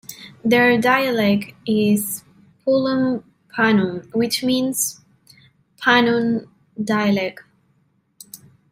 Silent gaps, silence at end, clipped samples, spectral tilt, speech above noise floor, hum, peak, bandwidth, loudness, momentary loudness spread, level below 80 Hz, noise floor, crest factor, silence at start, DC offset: none; 0.35 s; under 0.1%; -4 dB/octave; 45 dB; none; -2 dBFS; 16 kHz; -19 LUFS; 14 LU; -64 dBFS; -63 dBFS; 18 dB; 0.1 s; under 0.1%